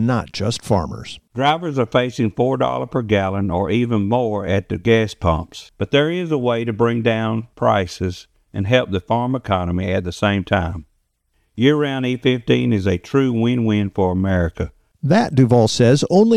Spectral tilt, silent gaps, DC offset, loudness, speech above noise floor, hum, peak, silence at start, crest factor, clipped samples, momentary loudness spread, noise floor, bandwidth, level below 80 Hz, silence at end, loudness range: -6.5 dB/octave; none; under 0.1%; -19 LUFS; 48 dB; none; -2 dBFS; 0 s; 16 dB; under 0.1%; 10 LU; -66 dBFS; 11.5 kHz; -42 dBFS; 0 s; 3 LU